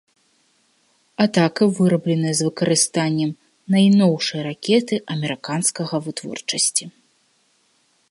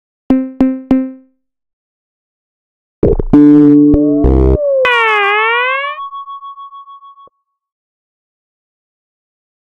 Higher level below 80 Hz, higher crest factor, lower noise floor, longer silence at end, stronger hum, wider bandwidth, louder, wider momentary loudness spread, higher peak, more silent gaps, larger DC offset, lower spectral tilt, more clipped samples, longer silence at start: second, -68 dBFS vs -24 dBFS; first, 20 dB vs 14 dB; first, -63 dBFS vs -48 dBFS; second, 1.2 s vs 2.75 s; neither; first, 11.5 kHz vs 5 kHz; second, -19 LUFS vs -10 LUFS; second, 10 LU vs 19 LU; about the same, -2 dBFS vs 0 dBFS; second, none vs 1.73-3.02 s; neither; second, -4.5 dB/octave vs -8 dB/octave; second, under 0.1% vs 0.3%; first, 1.2 s vs 0.3 s